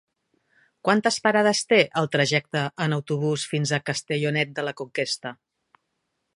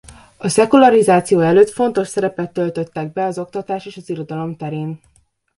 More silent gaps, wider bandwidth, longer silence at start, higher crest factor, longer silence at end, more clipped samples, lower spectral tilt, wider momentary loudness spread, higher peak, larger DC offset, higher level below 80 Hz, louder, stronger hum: neither; about the same, 11.5 kHz vs 11.5 kHz; first, 0.85 s vs 0.1 s; first, 22 dB vs 16 dB; first, 1.05 s vs 0.6 s; neither; second, -4.5 dB/octave vs -6 dB/octave; second, 9 LU vs 16 LU; second, -4 dBFS vs 0 dBFS; neither; second, -70 dBFS vs -56 dBFS; second, -23 LUFS vs -16 LUFS; neither